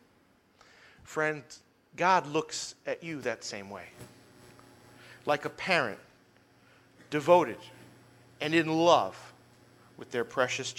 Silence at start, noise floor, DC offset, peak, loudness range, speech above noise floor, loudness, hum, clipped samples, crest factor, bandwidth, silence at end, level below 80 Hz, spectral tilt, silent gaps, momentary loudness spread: 1.1 s; -65 dBFS; under 0.1%; -8 dBFS; 6 LU; 36 dB; -29 LUFS; none; under 0.1%; 24 dB; 16 kHz; 0.05 s; -74 dBFS; -4 dB/octave; none; 25 LU